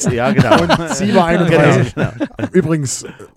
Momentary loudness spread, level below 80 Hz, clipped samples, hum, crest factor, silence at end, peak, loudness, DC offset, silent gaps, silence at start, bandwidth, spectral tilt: 10 LU; -40 dBFS; under 0.1%; none; 14 dB; 0.1 s; 0 dBFS; -14 LUFS; under 0.1%; none; 0 s; 15 kHz; -5.5 dB/octave